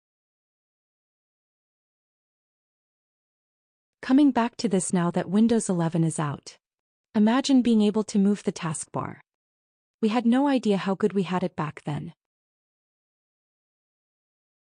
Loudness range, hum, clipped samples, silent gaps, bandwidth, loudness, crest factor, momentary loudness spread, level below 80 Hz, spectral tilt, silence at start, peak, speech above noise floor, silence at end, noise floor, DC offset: 6 LU; none; under 0.1%; 6.79-7.04 s, 9.34-9.99 s; 10 kHz; -24 LUFS; 16 dB; 13 LU; -68 dBFS; -6 dB/octave; 4 s; -12 dBFS; over 67 dB; 2.5 s; under -90 dBFS; under 0.1%